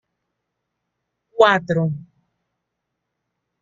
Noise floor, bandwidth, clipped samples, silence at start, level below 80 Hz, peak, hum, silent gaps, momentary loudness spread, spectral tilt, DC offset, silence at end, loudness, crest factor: -79 dBFS; 7.6 kHz; under 0.1%; 1.35 s; -62 dBFS; -2 dBFS; none; none; 19 LU; -6.5 dB/octave; under 0.1%; 1.6 s; -18 LUFS; 22 dB